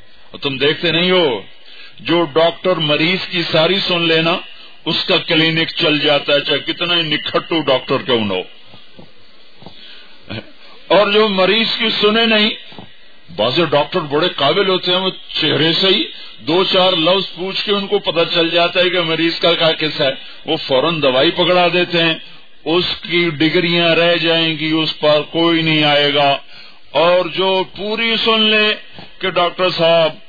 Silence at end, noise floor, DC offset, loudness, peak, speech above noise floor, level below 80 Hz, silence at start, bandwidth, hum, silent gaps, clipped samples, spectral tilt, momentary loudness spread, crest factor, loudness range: 0.1 s; -46 dBFS; 2%; -14 LUFS; 0 dBFS; 31 dB; -56 dBFS; 0.35 s; 5 kHz; none; none; under 0.1%; -6 dB/octave; 9 LU; 14 dB; 3 LU